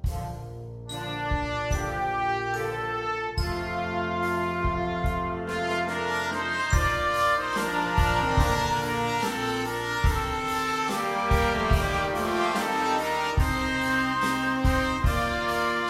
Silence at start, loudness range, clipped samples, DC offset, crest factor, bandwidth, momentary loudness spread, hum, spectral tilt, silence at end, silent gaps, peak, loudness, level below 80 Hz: 0 s; 4 LU; under 0.1%; under 0.1%; 18 dB; 16 kHz; 6 LU; none; -5 dB/octave; 0 s; none; -8 dBFS; -26 LUFS; -34 dBFS